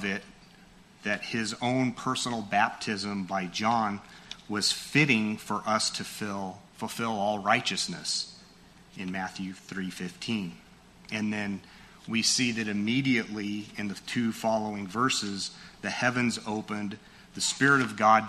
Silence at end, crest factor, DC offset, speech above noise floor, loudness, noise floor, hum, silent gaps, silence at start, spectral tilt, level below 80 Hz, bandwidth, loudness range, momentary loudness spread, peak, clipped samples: 0 s; 22 dB; under 0.1%; 26 dB; -29 LUFS; -55 dBFS; none; none; 0 s; -3.5 dB/octave; -64 dBFS; 13.5 kHz; 6 LU; 13 LU; -8 dBFS; under 0.1%